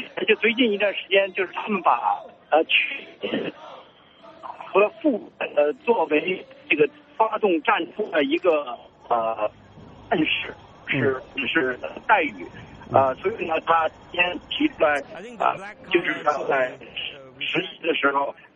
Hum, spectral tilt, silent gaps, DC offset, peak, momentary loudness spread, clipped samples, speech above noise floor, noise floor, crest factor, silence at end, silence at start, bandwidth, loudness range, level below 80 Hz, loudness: none; -6 dB/octave; none; under 0.1%; -2 dBFS; 11 LU; under 0.1%; 26 dB; -49 dBFS; 22 dB; 0.25 s; 0 s; 8.2 kHz; 3 LU; -60 dBFS; -23 LUFS